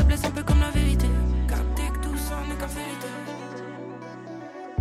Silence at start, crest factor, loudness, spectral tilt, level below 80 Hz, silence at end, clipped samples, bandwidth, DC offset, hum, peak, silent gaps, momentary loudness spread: 0 s; 14 dB; -27 LUFS; -6 dB/octave; -26 dBFS; 0 s; under 0.1%; 14.5 kHz; under 0.1%; none; -10 dBFS; none; 15 LU